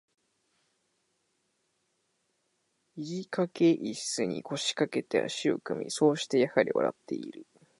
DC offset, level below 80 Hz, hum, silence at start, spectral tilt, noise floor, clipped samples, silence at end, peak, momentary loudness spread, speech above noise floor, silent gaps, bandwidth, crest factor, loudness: under 0.1%; -78 dBFS; none; 2.95 s; -4.5 dB/octave; -77 dBFS; under 0.1%; 0.35 s; -10 dBFS; 12 LU; 47 dB; none; 11.5 kHz; 22 dB; -30 LUFS